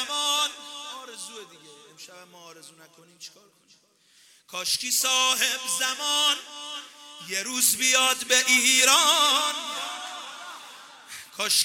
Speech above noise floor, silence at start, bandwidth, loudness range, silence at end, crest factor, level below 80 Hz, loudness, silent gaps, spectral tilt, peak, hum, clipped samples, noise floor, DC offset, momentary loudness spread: 35 dB; 0 s; 17 kHz; 14 LU; 0 s; 24 dB; -76 dBFS; -21 LUFS; none; 2 dB/octave; -2 dBFS; none; under 0.1%; -60 dBFS; under 0.1%; 24 LU